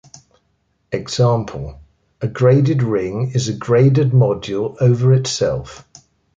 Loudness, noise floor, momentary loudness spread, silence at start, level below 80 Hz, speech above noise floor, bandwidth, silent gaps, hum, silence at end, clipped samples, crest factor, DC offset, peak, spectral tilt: -17 LUFS; -65 dBFS; 14 LU; 0.9 s; -46 dBFS; 49 dB; 7.8 kHz; none; none; 0.6 s; under 0.1%; 14 dB; under 0.1%; -2 dBFS; -6.5 dB/octave